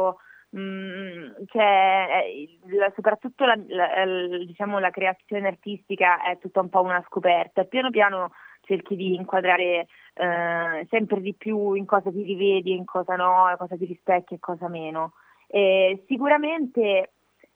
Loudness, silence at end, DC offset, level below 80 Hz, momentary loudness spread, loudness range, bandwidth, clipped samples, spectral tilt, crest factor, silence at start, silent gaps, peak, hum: -23 LUFS; 0.5 s; under 0.1%; -84 dBFS; 13 LU; 2 LU; 3.9 kHz; under 0.1%; -7.5 dB/octave; 20 dB; 0 s; none; -4 dBFS; none